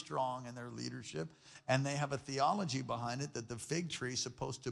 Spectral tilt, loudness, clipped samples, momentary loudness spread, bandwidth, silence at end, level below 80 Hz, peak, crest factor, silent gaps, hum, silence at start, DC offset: -4.5 dB/octave; -39 LUFS; under 0.1%; 10 LU; 12.5 kHz; 0 s; -70 dBFS; -18 dBFS; 20 dB; none; none; 0 s; under 0.1%